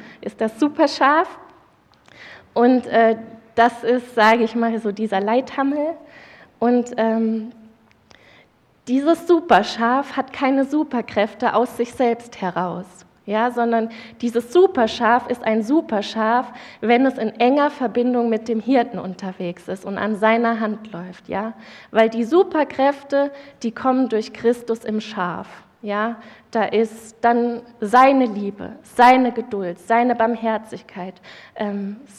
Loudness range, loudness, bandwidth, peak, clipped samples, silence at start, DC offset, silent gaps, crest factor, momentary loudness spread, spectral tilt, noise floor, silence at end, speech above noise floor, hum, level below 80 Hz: 5 LU; -19 LUFS; 13.5 kHz; -2 dBFS; under 0.1%; 0 s; under 0.1%; none; 18 dB; 13 LU; -5.5 dB/octave; -55 dBFS; 0.15 s; 35 dB; none; -62 dBFS